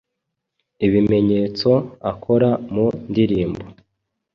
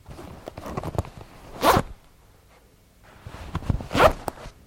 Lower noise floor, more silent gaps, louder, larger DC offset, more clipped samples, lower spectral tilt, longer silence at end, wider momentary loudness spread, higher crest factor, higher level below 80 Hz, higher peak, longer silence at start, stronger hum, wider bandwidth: first, -79 dBFS vs -55 dBFS; neither; first, -19 LUFS vs -24 LUFS; neither; neither; first, -9 dB/octave vs -5 dB/octave; first, 0.65 s vs 0.15 s; second, 10 LU vs 24 LU; second, 16 dB vs 24 dB; second, -46 dBFS vs -40 dBFS; about the same, -4 dBFS vs -2 dBFS; first, 0.8 s vs 0.1 s; neither; second, 6.8 kHz vs 16.5 kHz